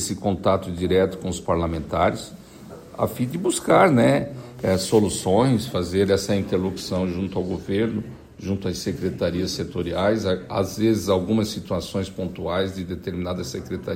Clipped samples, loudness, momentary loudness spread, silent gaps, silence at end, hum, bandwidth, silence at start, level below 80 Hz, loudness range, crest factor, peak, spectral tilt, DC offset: under 0.1%; -23 LUFS; 11 LU; none; 0 s; none; 16 kHz; 0 s; -50 dBFS; 5 LU; 20 dB; -4 dBFS; -5.5 dB/octave; under 0.1%